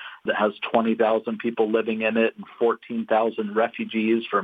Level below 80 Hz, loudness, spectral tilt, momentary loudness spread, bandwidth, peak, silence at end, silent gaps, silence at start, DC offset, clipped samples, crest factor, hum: -78 dBFS; -24 LUFS; -8 dB/octave; 4 LU; 4.8 kHz; -6 dBFS; 0 s; none; 0 s; under 0.1%; under 0.1%; 18 dB; none